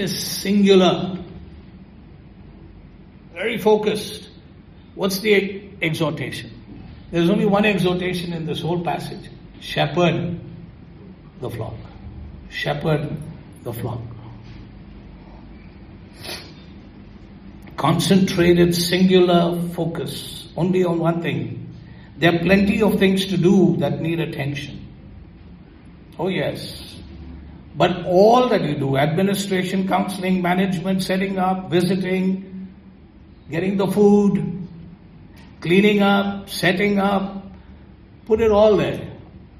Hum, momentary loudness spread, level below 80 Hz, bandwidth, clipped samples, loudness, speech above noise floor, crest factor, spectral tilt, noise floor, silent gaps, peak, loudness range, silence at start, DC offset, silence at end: none; 23 LU; -46 dBFS; 14 kHz; under 0.1%; -19 LUFS; 27 dB; 20 dB; -6 dB/octave; -45 dBFS; none; -2 dBFS; 10 LU; 0 s; under 0.1%; 0.15 s